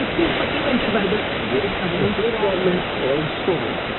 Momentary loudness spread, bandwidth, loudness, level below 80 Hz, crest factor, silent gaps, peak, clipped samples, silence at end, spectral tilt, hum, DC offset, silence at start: 3 LU; 4.3 kHz; -20 LUFS; -42 dBFS; 14 dB; none; -6 dBFS; under 0.1%; 0 s; -3.5 dB/octave; none; under 0.1%; 0 s